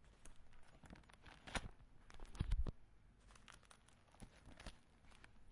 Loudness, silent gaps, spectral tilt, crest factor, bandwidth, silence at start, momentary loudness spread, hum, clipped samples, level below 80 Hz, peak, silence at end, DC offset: -53 LUFS; none; -4.5 dB/octave; 24 dB; 11.5 kHz; 0 s; 21 LU; none; under 0.1%; -54 dBFS; -26 dBFS; 0 s; under 0.1%